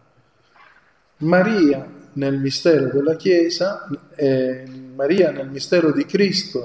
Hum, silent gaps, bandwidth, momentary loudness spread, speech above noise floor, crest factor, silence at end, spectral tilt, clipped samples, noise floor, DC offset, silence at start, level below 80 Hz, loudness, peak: none; none; 8 kHz; 11 LU; 40 dB; 16 dB; 0 s; -6 dB/octave; under 0.1%; -58 dBFS; under 0.1%; 1.2 s; -64 dBFS; -19 LUFS; -2 dBFS